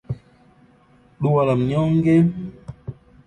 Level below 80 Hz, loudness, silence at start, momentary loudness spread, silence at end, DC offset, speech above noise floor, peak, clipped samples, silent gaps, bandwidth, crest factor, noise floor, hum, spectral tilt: -50 dBFS; -19 LUFS; 0.1 s; 20 LU; 0.35 s; under 0.1%; 37 dB; -6 dBFS; under 0.1%; none; 9.2 kHz; 16 dB; -54 dBFS; none; -9.5 dB/octave